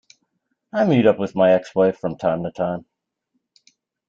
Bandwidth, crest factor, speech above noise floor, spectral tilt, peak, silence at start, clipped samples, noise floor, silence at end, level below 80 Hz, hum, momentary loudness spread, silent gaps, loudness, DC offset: 7.6 kHz; 18 dB; 56 dB; -8 dB/octave; -4 dBFS; 0.75 s; under 0.1%; -74 dBFS; 1.3 s; -60 dBFS; none; 10 LU; none; -20 LUFS; under 0.1%